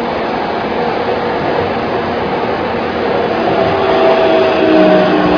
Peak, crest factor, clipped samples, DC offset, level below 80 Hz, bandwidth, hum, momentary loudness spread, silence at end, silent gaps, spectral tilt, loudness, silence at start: 0 dBFS; 12 dB; under 0.1%; under 0.1%; -40 dBFS; 5.4 kHz; none; 7 LU; 0 s; none; -7 dB/octave; -13 LUFS; 0 s